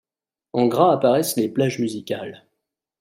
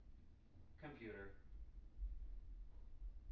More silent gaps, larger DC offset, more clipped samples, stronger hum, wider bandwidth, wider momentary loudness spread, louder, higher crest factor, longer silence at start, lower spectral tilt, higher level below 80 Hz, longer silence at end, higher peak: neither; neither; neither; neither; first, 16 kHz vs 4.9 kHz; about the same, 13 LU vs 14 LU; first, -21 LUFS vs -58 LUFS; about the same, 18 dB vs 14 dB; first, 0.55 s vs 0 s; about the same, -5.5 dB/octave vs -6.5 dB/octave; second, -68 dBFS vs -56 dBFS; first, 0.65 s vs 0 s; first, -4 dBFS vs -38 dBFS